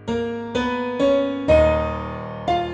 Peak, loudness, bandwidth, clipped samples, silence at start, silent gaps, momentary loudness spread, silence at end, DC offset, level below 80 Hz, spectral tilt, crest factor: -4 dBFS; -21 LUFS; 8.8 kHz; under 0.1%; 0 s; none; 11 LU; 0 s; under 0.1%; -34 dBFS; -7 dB/octave; 16 dB